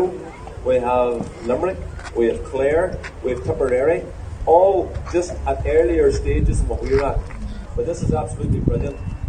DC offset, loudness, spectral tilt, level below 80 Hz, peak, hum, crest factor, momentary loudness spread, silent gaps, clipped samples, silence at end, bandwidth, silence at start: under 0.1%; -20 LUFS; -7.5 dB/octave; -28 dBFS; 0 dBFS; none; 18 dB; 11 LU; none; under 0.1%; 0 s; 10 kHz; 0 s